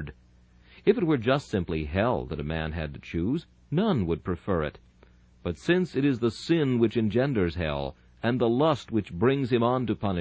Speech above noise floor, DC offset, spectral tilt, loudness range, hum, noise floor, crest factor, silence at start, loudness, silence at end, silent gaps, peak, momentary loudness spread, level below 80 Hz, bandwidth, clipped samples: 31 dB; under 0.1%; -7.5 dB/octave; 3 LU; 60 Hz at -50 dBFS; -57 dBFS; 18 dB; 0 s; -27 LUFS; 0 s; none; -8 dBFS; 9 LU; -44 dBFS; 8 kHz; under 0.1%